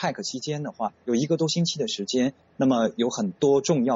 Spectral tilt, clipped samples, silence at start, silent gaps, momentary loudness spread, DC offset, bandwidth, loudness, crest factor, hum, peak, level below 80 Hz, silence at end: -5 dB/octave; under 0.1%; 0 s; none; 9 LU; under 0.1%; 8 kHz; -25 LUFS; 14 dB; none; -10 dBFS; -66 dBFS; 0 s